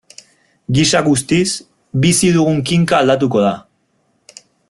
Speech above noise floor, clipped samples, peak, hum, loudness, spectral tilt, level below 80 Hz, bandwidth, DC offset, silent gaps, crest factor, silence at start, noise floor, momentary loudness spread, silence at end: 49 dB; under 0.1%; -2 dBFS; none; -14 LUFS; -4.5 dB/octave; -46 dBFS; 12.5 kHz; under 0.1%; none; 14 dB; 0.7 s; -62 dBFS; 11 LU; 1.1 s